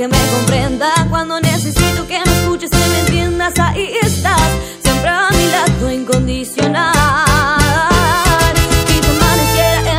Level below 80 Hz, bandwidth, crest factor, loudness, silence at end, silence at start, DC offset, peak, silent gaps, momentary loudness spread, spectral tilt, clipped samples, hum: -22 dBFS; 16.5 kHz; 12 dB; -13 LUFS; 0 s; 0 s; under 0.1%; 0 dBFS; none; 4 LU; -4 dB/octave; under 0.1%; none